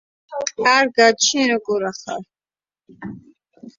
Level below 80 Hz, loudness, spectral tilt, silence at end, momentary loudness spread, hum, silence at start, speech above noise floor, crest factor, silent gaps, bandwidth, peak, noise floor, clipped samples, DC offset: -64 dBFS; -17 LUFS; -1.5 dB/octave; 0.1 s; 22 LU; none; 0.3 s; over 71 dB; 20 dB; none; 7.8 kHz; -2 dBFS; under -90 dBFS; under 0.1%; under 0.1%